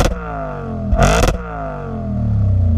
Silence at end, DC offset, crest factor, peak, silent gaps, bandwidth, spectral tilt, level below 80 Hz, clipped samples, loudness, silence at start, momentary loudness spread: 0 s; under 0.1%; 16 dB; -2 dBFS; none; 15.5 kHz; -6 dB/octave; -22 dBFS; under 0.1%; -19 LUFS; 0 s; 11 LU